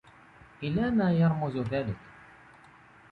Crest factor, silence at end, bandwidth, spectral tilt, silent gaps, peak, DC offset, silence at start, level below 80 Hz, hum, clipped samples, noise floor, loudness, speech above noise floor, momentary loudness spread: 14 dB; 1 s; 4.9 kHz; -9.5 dB/octave; none; -16 dBFS; under 0.1%; 0.6 s; -56 dBFS; none; under 0.1%; -55 dBFS; -28 LUFS; 28 dB; 13 LU